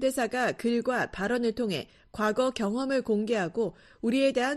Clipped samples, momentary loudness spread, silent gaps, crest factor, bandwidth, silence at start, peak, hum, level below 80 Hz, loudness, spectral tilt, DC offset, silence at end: under 0.1%; 6 LU; none; 14 dB; 13 kHz; 0 s; -14 dBFS; none; -58 dBFS; -29 LUFS; -5 dB/octave; under 0.1%; 0 s